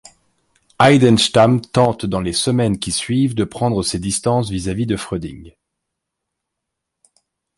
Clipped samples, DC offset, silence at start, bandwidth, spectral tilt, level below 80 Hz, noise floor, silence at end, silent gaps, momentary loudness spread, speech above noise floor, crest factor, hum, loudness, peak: under 0.1%; under 0.1%; 0.8 s; 11.5 kHz; -5 dB/octave; -42 dBFS; -79 dBFS; 2.1 s; none; 10 LU; 63 dB; 18 dB; none; -17 LUFS; 0 dBFS